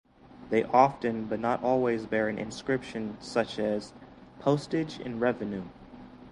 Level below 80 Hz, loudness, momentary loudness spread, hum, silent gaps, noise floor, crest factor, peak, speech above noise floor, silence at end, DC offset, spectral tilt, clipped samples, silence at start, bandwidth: -60 dBFS; -29 LUFS; 13 LU; none; none; -48 dBFS; 24 dB; -6 dBFS; 20 dB; 0 s; under 0.1%; -6.5 dB/octave; under 0.1%; 0.25 s; 11 kHz